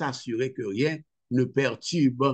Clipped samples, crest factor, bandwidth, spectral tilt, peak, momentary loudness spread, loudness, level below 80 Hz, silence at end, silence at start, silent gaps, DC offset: under 0.1%; 16 dB; 8.8 kHz; -6 dB/octave; -10 dBFS; 6 LU; -27 LUFS; -72 dBFS; 0 s; 0 s; none; under 0.1%